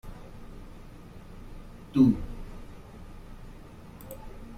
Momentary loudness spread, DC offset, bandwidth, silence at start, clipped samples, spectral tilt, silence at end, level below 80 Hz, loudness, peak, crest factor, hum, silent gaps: 26 LU; under 0.1%; 16 kHz; 0.05 s; under 0.1%; -8.5 dB/octave; 0 s; -44 dBFS; -25 LUFS; -10 dBFS; 22 dB; none; none